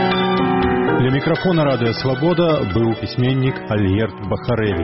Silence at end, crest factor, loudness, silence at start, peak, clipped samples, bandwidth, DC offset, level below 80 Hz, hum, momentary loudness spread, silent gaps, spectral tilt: 0 s; 12 dB; -18 LUFS; 0 s; -6 dBFS; under 0.1%; 6 kHz; under 0.1%; -40 dBFS; none; 4 LU; none; -5.5 dB/octave